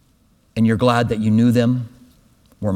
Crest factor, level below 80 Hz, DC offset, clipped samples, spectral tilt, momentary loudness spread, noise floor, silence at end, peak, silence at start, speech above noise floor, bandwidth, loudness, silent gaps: 18 dB; -48 dBFS; under 0.1%; under 0.1%; -7.5 dB/octave; 13 LU; -57 dBFS; 0 s; -2 dBFS; 0.55 s; 41 dB; 13.5 kHz; -17 LUFS; none